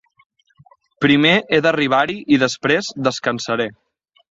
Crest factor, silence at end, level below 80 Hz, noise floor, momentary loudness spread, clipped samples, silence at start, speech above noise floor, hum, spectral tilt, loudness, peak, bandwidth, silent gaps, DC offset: 18 dB; 0.6 s; -56 dBFS; -53 dBFS; 8 LU; under 0.1%; 1 s; 36 dB; none; -4.5 dB/octave; -17 LUFS; -2 dBFS; 7.8 kHz; none; under 0.1%